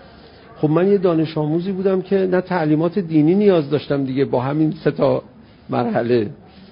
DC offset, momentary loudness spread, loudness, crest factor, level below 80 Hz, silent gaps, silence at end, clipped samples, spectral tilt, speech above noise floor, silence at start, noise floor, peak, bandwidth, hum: under 0.1%; 6 LU; -18 LUFS; 16 dB; -54 dBFS; none; 0.35 s; under 0.1%; -13 dB/octave; 26 dB; 0.55 s; -43 dBFS; -2 dBFS; 5.4 kHz; none